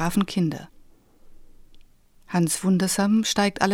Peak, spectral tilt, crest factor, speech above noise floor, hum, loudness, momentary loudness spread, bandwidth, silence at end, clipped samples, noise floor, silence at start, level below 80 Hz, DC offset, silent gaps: -4 dBFS; -4.5 dB/octave; 20 dB; 30 dB; none; -23 LUFS; 7 LU; 17 kHz; 0 s; under 0.1%; -52 dBFS; 0 s; -50 dBFS; under 0.1%; none